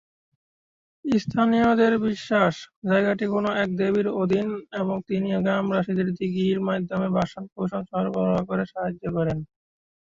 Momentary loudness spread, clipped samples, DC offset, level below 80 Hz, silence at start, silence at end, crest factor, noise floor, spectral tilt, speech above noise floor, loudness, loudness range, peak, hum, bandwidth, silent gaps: 9 LU; under 0.1%; under 0.1%; -56 dBFS; 1.05 s; 0.65 s; 18 dB; under -90 dBFS; -7.5 dB/octave; over 67 dB; -24 LUFS; 4 LU; -6 dBFS; none; 7.6 kHz; 2.76-2.82 s, 7.52-7.56 s